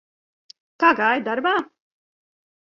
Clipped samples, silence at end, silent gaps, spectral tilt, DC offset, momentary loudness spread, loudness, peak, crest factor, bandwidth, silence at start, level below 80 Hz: under 0.1%; 1.1 s; none; -5 dB/octave; under 0.1%; 8 LU; -20 LUFS; -4 dBFS; 20 dB; 7.2 kHz; 0.8 s; -72 dBFS